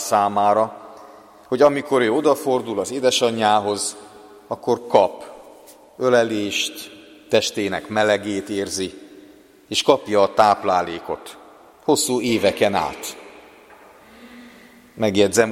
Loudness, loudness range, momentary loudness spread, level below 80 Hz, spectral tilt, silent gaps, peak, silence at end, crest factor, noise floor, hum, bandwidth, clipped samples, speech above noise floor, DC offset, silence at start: -20 LUFS; 4 LU; 15 LU; -60 dBFS; -3.5 dB/octave; none; 0 dBFS; 0 s; 20 dB; -48 dBFS; none; 16.5 kHz; under 0.1%; 28 dB; under 0.1%; 0 s